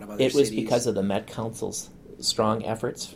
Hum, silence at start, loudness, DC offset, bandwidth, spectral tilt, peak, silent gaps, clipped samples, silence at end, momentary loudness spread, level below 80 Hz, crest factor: none; 0 s; -26 LUFS; under 0.1%; 16 kHz; -4.5 dB/octave; -8 dBFS; none; under 0.1%; 0 s; 10 LU; -56 dBFS; 18 dB